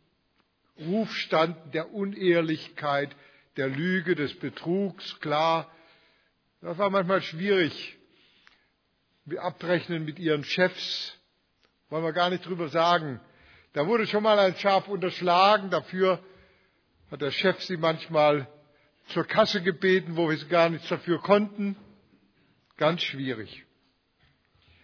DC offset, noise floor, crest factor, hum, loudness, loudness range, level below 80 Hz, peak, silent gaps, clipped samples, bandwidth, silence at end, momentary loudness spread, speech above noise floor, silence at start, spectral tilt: under 0.1%; -72 dBFS; 22 dB; none; -26 LUFS; 6 LU; -74 dBFS; -6 dBFS; none; under 0.1%; 5.4 kHz; 1.25 s; 13 LU; 46 dB; 0.8 s; -6 dB/octave